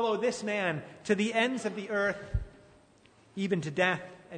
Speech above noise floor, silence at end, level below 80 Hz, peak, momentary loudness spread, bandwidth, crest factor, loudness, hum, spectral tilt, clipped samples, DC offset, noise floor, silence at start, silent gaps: 30 dB; 0 s; -48 dBFS; -12 dBFS; 10 LU; 9.6 kHz; 20 dB; -31 LUFS; none; -5 dB/octave; under 0.1%; under 0.1%; -61 dBFS; 0 s; none